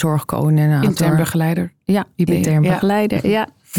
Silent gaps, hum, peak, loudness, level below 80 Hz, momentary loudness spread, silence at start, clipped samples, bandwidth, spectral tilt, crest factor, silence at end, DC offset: none; none; -4 dBFS; -17 LUFS; -48 dBFS; 5 LU; 0 s; under 0.1%; 17.5 kHz; -7 dB/octave; 12 dB; 0 s; 0.2%